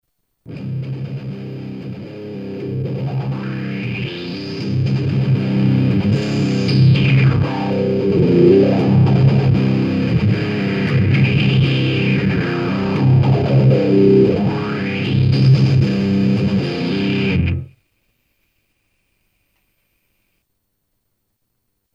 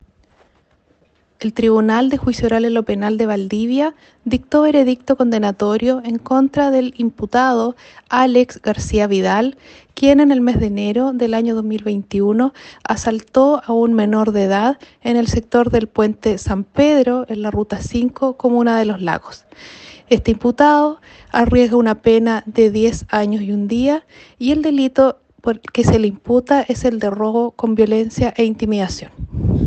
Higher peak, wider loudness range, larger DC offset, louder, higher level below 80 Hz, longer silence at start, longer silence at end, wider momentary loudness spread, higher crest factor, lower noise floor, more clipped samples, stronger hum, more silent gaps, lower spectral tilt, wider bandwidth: about the same, -2 dBFS vs 0 dBFS; first, 11 LU vs 2 LU; neither; about the same, -16 LUFS vs -16 LUFS; about the same, -40 dBFS vs -38 dBFS; second, 0.5 s vs 1.4 s; first, 4.3 s vs 0 s; first, 14 LU vs 9 LU; about the same, 14 dB vs 16 dB; first, -71 dBFS vs -57 dBFS; neither; neither; neither; first, -8.5 dB/octave vs -6.5 dB/octave; second, 7.2 kHz vs 8.6 kHz